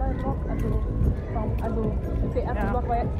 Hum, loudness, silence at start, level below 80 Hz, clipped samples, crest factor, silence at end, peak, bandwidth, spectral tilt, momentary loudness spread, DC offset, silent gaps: none; -27 LUFS; 0 s; -28 dBFS; under 0.1%; 14 dB; 0 s; -10 dBFS; 6.6 kHz; -9.5 dB/octave; 3 LU; under 0.1%; none